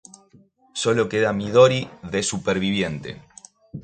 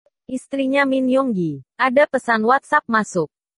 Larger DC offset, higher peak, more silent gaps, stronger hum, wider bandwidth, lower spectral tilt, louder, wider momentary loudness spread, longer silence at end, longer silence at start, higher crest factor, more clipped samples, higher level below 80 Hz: neither; about the same, -2 dBFS vs -2 dBFS; neither; neither; second, 9.4 kHz vs 11 kHz; about the same, -4.5 dB/octave vs -5.5 dB/octave; about the same, -21 LUFS vs -19 LUFS; first, 19 LU vs 10 LU; second, 0 s vs 0.3 s; first, 0.75 s vs 0.3 s; about the same, 20 dB vs 18 dB; neither; first, -52 dBFS vs -66 dBFS